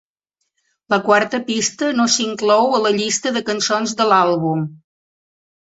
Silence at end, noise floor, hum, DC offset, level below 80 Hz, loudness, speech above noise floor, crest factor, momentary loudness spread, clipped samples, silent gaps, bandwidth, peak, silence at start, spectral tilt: 0.9 s; -75 dBFS; none; under 0.1%; -64 dBFS; -17 LUFS; 58 dB; 16 dB; 6 LU; under 0.1%; none; 8.2 kHz; -2 dBFS; 0.9 s; -3.5 dB/octave